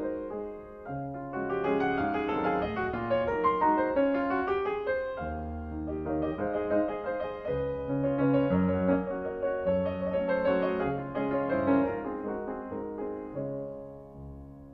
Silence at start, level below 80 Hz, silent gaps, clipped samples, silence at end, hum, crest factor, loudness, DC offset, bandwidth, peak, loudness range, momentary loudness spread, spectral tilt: 0 s; -50 dBFS; none; under 0.1%; 0 s; none; 16 dB; -30 LUFS; under 0.1%; 5.4 kHz; -12 dBFS; 4 LU; 11 LU; -9.5 dB/octave